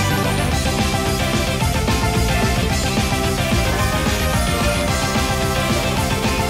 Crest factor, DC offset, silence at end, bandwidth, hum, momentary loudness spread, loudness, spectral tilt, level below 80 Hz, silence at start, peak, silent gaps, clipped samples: 12 dB; under 0.1%; 0 s; 16 kHz; none; 1 LU; -18 LUFS; -4.5 dB/octave; -26 dBFS; 0 s; -6 dBFS; none; under 0.1%